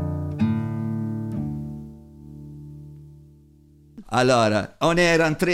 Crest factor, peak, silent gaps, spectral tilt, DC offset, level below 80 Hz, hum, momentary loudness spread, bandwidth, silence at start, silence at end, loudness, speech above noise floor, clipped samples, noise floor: 18 dB; -6 dBFS; none; -5.5 dB/octave; under 0.1%; -48 dBFS; none; 24 LU; 16 kHz; 0 s; 0 s; -22 LUFS; 33 dB; under 0.1%; -52 dBFS